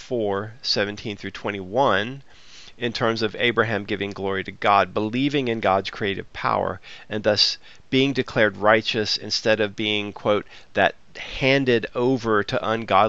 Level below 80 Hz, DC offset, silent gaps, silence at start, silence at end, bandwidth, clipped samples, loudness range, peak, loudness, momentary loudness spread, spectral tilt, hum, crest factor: -52 dBFS; 0.5%; none; 0 s; 0 s; 8 kHz; under 0.1%; 3 LU; -2 dBFS; -22 LUFS; 10 LU; -4.5 dB/octave; none; 22 dB